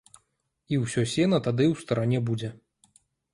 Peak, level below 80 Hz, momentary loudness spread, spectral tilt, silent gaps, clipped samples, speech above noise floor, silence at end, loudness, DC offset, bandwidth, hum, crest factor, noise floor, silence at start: -10 dBFS; -60 dBFS; 7 LU; -6.5 dB/octave; none; under 0.1%; 50 dB; 0.8 s; -26 LUFS; under 0.1%; 11.5 kHz; none; 18 dB; -75 dBFS; 0.7 s